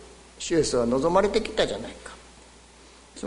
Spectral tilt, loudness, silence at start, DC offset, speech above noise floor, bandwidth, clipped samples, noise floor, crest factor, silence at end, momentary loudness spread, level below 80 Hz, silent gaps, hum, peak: -4 dB/octave; -24 LUFS; 0 s; under 0.1%; 27 dB; 11 kHz; under 0.1%; -51 dBFS; 20 dB; 0 s; 21 LU; -48 dBFS; none; none; -8 dBFS